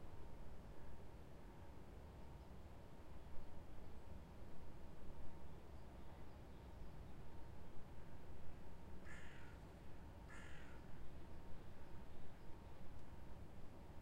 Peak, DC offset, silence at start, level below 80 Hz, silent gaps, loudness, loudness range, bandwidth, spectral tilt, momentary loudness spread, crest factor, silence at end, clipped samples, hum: -34 dBFS; under 0.1%; 0 s; -60 dBFS; none; -60 LUFS; 1 LU; 15 kHz; -6.5 dB/octave; 2 LU; 14 dB; 0 s; under 0.1%; none